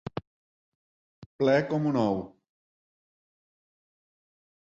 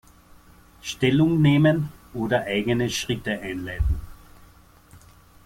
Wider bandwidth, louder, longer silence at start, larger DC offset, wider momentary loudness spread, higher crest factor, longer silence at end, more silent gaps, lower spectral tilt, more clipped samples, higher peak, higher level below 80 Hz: second, 7.8 kHz vs 16 kHz; second, -27 LUFS vs -23 LUFS; second, 0.15 s vs 0.85 s; neither; first, 17 LU vs 14 LU; about the same, 22 dB vs 18 dB; first, 2.5 s vs 0.45 s; first, 0.27-1.39 s vs none; first, -7.5 dB/octave vs -6 dB/octave; neither; second, -12 dBFS vs -6 dBFS; second, -64 dBFS vs -38 dBFS